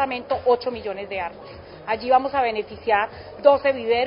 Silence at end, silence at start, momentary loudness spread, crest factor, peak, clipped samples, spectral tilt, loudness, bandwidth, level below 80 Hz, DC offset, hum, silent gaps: 0 s; 0 s; 13 LU; 20 dB; -2 dBFS; under 0.1%; -9 dB/octave; -22 LUFS; 5.4 kHz; -52 dBFS; under 0.1%; none; none